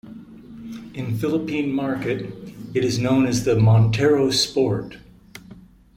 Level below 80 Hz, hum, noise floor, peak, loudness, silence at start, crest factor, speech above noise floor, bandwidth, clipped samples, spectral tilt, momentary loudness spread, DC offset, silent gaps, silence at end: -48 dBFS; none; -46 dBFS; -6 dBFS; -20 LUFS; 0.05 s; 16 dB; 26 dB; 15.5 kHz; under 0.1%; -6 dB/octave; 22 LU; under 0.1%; none; 0.35 s